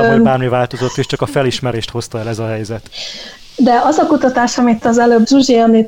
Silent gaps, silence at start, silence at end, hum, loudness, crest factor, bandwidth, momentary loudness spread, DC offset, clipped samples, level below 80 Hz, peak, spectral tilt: none; 0 s; 0 s; none; -13 LUFS; 12 dB; 15.5 kHz; 15 LU; 0.5%; under 0.1%; -44 dBFS; -2 dBFS; -5.5 dB/octave